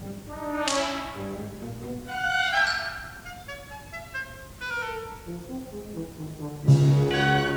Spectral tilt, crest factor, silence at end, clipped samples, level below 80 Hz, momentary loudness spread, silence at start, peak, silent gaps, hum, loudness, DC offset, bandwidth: -5 dB/octave; 20 dB; 0 s; under 0.1%; -50 dBFS; 18 LU; 0 s; -8 dBFS; none; none; -27 LUFS; under 0.1%; over 20 kHz